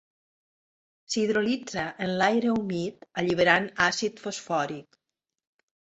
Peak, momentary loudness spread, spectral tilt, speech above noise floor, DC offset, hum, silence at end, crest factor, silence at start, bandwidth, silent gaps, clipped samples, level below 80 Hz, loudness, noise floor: -4 dBFS; 11 LU; -4 dB/octave; 60 dB; under 0.1%; none; 1.1 s; 24 dB; 1.1 s; 8.2 kHz; none; under 0.1%; -62 dBFS; -26 LUFS; -86 dBFS